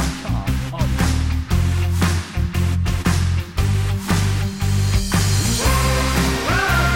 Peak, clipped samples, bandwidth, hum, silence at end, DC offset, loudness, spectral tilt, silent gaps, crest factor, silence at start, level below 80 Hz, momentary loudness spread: -6 dBFS; under 0.1%; 17 kHz; none; 0 s; under 0.1%; -19 LUFS; -5 dB/octave; none; 12 dB; 0 s; -24 dBFS; 5 LU